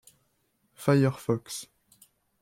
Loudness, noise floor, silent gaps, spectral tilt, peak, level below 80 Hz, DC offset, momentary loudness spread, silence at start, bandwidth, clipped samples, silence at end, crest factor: -28 LUFS; -72 dBFS; none; -6.5 dB/octave; -12 dBFS; -68 dBFS; under 0.1%; 15 LU; 0.8 s; 16 kHz; under 0.1%; 0.75 s; 20 dB